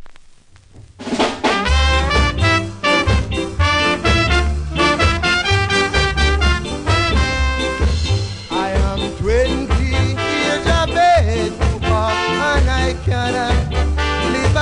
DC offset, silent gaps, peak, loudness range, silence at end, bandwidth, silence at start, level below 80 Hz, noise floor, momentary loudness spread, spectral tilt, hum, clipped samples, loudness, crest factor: under 0.1%; none; -2 dBFS; 3 LU; 0 s; 10.5 kHz; 0 s; -22 dBFS; -44 dBFS; 5 LU; -5 dB/octave; none; under 0.1%; -16 LUFS; 14 dB